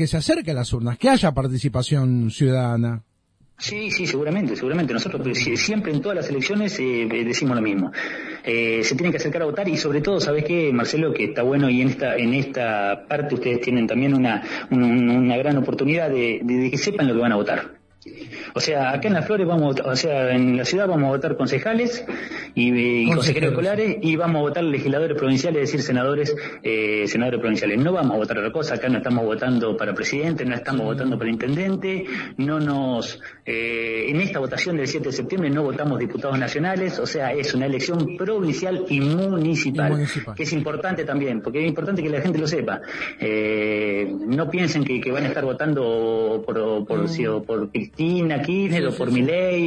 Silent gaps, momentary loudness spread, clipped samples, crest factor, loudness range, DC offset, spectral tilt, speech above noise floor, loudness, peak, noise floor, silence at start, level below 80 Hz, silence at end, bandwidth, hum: none; 6 LU; under 0.1%; 16 dB; 3 LU; under 0.1%; -6 dB/octave; 38 dB; -22 LUFS; -6 dBFS; -60 dBFS; 0 s; -52 dBFS; 0 s; 10.5 kHz; none